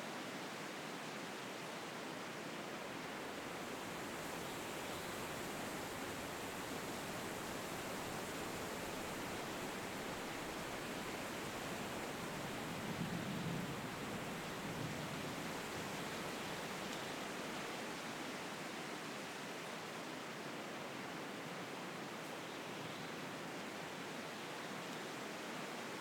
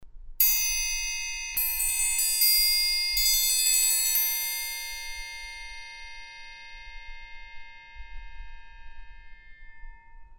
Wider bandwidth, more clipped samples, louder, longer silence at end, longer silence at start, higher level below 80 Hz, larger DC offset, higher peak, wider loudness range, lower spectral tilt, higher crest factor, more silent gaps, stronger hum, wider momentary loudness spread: about the same, 19 kHz vs over 20 kHz; neither; second, -45 LUFS vs -23 LUFS; about the same, 0 s vs 0 s; about the same, 0 s vs 0 s; second, -70 dBFS vs -44 dBFS; neither; second, -30 dBFS vs -8 dBFS; second, 3 LU vs 22 LU; first, -3.5 dB/octave vs 4 dB/octave; second, 16 dB vs 22 dB; neither; neither; second, 3 LU vs 24 LU